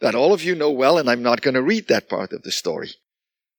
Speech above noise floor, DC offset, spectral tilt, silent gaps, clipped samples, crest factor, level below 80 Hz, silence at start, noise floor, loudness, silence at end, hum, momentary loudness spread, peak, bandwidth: 70 dB; under 0.1%; -4 dB/octave; none; under 0.1%; 18 dB; -70 dBFS; 0 s; -89 dBFS; -19 LUFS; 0.65 s; none; 11 LU; -2 dBFS; 19 kHz